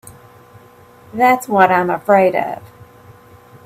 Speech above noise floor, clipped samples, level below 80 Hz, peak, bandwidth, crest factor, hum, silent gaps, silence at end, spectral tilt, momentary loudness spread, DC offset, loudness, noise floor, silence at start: 30 dB; under 0.1%; -60 dBFS; 0 dBFS; 16 kHz; 18 dB; none; none; 1 s; -6 dB/octave; 15 LU; under 0.1%; -14 LUFS; -44 dBFS; 0.05 s